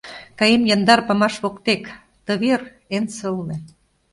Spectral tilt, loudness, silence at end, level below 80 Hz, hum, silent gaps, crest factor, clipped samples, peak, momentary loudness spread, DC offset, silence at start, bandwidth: -4.5 dB/octave; -19 LUFS; 0.45 s; -58 dBFS; none; none; 20 dB; under 0.1%; 0 dBFS; 17 LU; under 0.1%; 0.05 s; 11.5 kHz